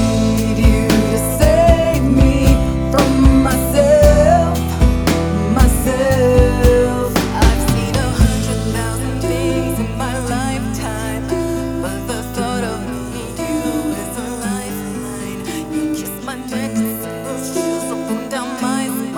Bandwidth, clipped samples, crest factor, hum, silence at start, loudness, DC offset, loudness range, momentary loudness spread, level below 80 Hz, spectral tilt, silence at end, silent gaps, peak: over 20 kHz; under 0.1%; 16 dB; none; 0 s; -16 LUFS; under 0.1%; 10 LU; 12 LU; -20 dBFS; -6 dB/octave; 0 s; none; 0 dBFS